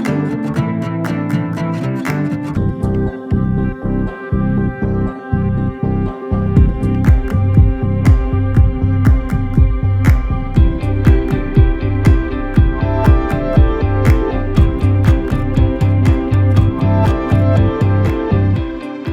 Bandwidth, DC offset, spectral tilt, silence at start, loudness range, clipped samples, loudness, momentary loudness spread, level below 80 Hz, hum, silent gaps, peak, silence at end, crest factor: 7.8 kHz; under 0.1%; -9 dB/octave; 0 s; 4 LU; under 0.1%; -15 LUFS; 6 LU; -18 dBFS; none; none; 0 dBFS; 0 s; 14 dB